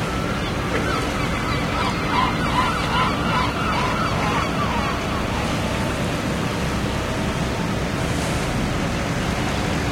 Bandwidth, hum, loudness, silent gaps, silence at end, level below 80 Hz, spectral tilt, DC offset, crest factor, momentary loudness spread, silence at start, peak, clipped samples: 16.5 kHz; none; -22 LUFS; none; 0 s; -32 dBFS; -5 dB/octave; under 0.1%; 14 dB; 3 LU; 0 s; -8 dBFS; under 0.1%